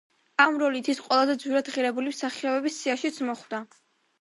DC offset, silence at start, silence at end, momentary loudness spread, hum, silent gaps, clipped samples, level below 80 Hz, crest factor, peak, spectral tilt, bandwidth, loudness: under 0.1%; 0.4 s; 0.55 s; 10 LU; none; none; under 0.1%; -82 dBFS; 22 dB; -6 dBFS; -2.5 dB/octave; 11.5 kHz; -26 LUFS